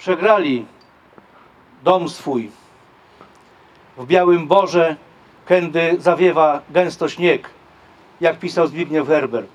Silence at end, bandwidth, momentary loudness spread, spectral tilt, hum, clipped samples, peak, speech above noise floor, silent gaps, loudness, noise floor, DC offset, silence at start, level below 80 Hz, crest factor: 0.1 s; 10.5 kHz; 10 LU; -6 dB/octave; none; under 0.1%; 0 dBFS; 33 dB; none; -17 LUFS; -49 dBFS; under 0.1%; 0 s; -66 dBFS; 18 dB